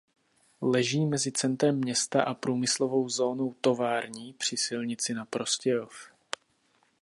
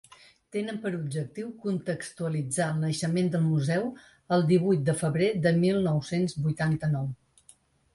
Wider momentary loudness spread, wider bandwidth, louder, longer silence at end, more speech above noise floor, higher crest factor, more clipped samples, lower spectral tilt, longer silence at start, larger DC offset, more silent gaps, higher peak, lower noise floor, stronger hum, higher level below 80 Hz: first, 14 LU vs 11 LU; about the same, 11.5 kHz vs 11.5 kHz; about the same, -28 LUFS vs -28 LUFS; first, 0.95 s vs 0.8 s; first, 41 dB vs 33 dB; about the same, 20 dB vs 18 dB; neither; second, -4 dB/octave vs -6.5 dB/octave; about the same, 0.6 s vs 0.55 s; neither; neither; about the same, -8 dBFS vs -10 dBFS; first, -69 dBFS vs -60 dBFS; neither; second, -76 dBFS vs -62 dBFS